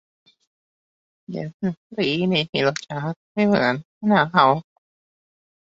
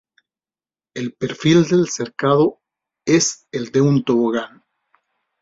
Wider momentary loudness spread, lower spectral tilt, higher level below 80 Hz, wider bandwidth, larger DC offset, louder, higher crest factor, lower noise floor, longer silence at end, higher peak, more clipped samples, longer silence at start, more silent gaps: about the same, 12 LU vs 14 LU; about the same, -6 dB/octave vs -5 dB/octave; about the same, -62 dBFS vs -58 dBFS; about the same, 7.8 kHz vs 7.8 kHz; neither; second, -21 LUFS vs -18 LUFS; about the same, 22 dB vs 18 dB; about the same, under -90 dBFS vs under -90 dBFS; first, 1.15 s vs 0.95 s; about the same, -2 dBFS vs -2 dBFS; neither; first, 1.3 s vs 0.95 s; first, 1.54-1.60 s, 1.77-1.90 s, 2.49-2.53 s, 3.16-3.35 s, 3.85-4.01 s vs none